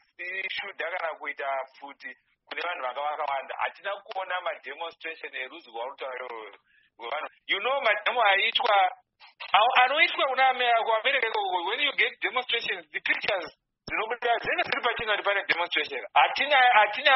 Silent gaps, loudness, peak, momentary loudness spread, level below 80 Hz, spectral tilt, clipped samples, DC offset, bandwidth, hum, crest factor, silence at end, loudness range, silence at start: none; -26 LUFS; -6 dBFS; 16 LU; -68 dBFS; 3 dB/octave; under 0.1%; under 0.1%; 5.8 kHz; none; 20 dB; 0 s; 11 LU; 0.2 s